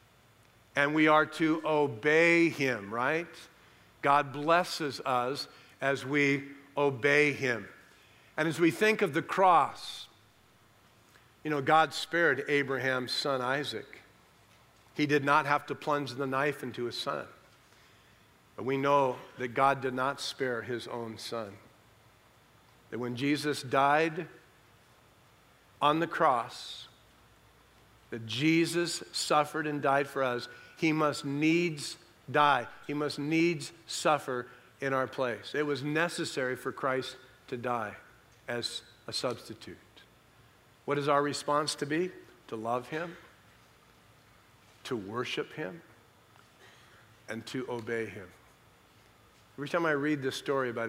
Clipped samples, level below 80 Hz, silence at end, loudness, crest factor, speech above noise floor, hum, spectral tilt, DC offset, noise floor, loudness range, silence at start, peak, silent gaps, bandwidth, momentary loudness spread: under 0.1%; -74 dBFS; 0 s; -30 LUFS; 22 dB; 33 dB; none; -4.5 dB/octave; under 0.1%; -63 dBFS; 11 LU; 0.75 s; -10 dBFS; none; 16 kHz; 16 LU